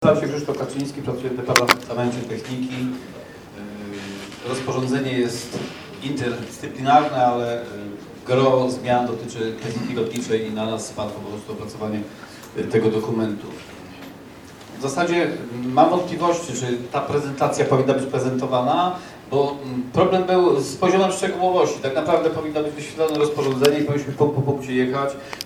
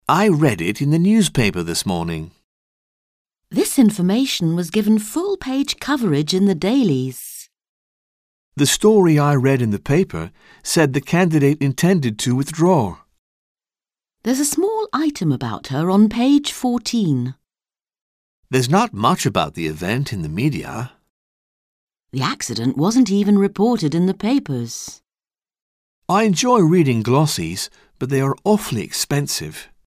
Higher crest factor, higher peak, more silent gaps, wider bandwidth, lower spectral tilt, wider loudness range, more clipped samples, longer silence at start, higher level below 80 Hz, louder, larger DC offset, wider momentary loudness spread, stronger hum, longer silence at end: first, 22 dB vs 16 dB; about the same, 0 dBFS vs -2 dBFS; second, none vs 2.44-3.25 s, 7.69-8.52 s, 13.19-13.55 s, 18.01-18.43 s, 21.10-21.87 s, 25.62-26.02 s; first, 19.5 kHz vs 16 kHz; about the same, -5.5 dB/octave vs -5.5 dB/octave; first, 7 LU vs 3 LU; neither; about the same, 0 s vs 0.1 s; second, -56 dBFS vs -48 dBFS; second, -22 LUFS vs -18 LUFS; neither; first, 16 LU vs 12 LU; neither; second, 0 s vs 0.25 s